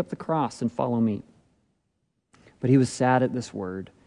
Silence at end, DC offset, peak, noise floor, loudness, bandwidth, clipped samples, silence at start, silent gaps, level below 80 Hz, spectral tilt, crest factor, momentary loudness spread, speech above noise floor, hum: 0.2 s; under 0.1%; -8 dBFS; -75 dBFS; -25 LUFS; 11 kHz; under 0.1%; 0 s; none; -64 dBFS; -7 dB/octave; 18 dB; 12 LU; 51 dB; none